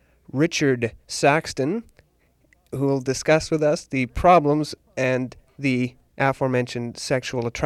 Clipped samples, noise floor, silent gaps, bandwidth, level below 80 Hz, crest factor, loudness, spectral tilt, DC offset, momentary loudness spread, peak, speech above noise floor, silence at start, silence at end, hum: under 0.1%; -62 dBFS; none; 14 kHz; -46 dBFS; 18 dB; -22 LUFS; -5.5 dB/octave; under 0.1%; 11 LU; -6 dBFS; 41 dB; 0.35 s; 0 s; none